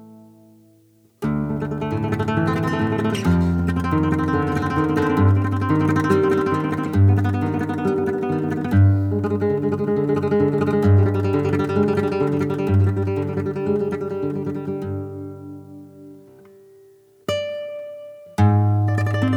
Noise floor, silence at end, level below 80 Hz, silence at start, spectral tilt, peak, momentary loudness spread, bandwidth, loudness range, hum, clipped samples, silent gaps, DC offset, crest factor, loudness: -55 dBFS; 0 s; -44 dBFS; 0 s; -8.5 dB/octave; -4 dBFS; 12 LU; 9.2 kHz; 10 LU; none; under 0.1%; none; under 0.1%; 16 dB; -20 LUFS